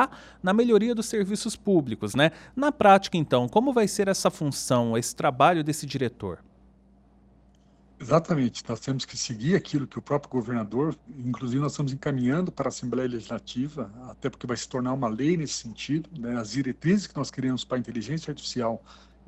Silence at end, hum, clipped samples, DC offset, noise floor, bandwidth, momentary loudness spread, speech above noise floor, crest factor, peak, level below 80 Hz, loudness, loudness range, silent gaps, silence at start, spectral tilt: 0.35 s; none; under 0.1%; under 0.1%; -58 dBFS; 14 kHz; 11 LU; 32 dB; 20 dB; -6 dBFS; -58 dBFS; -26 LUFS; 7 LU; none; 0 s; -5.5 dB/octave